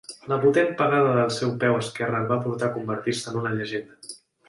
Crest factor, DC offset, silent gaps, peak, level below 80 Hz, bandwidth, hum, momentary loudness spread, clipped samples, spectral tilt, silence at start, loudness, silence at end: 16 dB; under 0.1%; none; -8 dBFS; -64 dBFS; 11.5 kHz; none; 11 LU; under 0.1%; -5.5 dB/octave; 0.1 s; -24 LUFS; 0.35 s